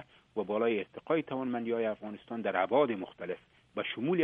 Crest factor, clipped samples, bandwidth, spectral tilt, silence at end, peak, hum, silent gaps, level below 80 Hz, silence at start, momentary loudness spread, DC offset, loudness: 18 dB; under 0.1%; 4 kHz; -8.5 dB/octave; 0 s; -14 dBFS; none; none; -76 dBFS; 0 s; 12 LU; under 0.1%; -33 LUFS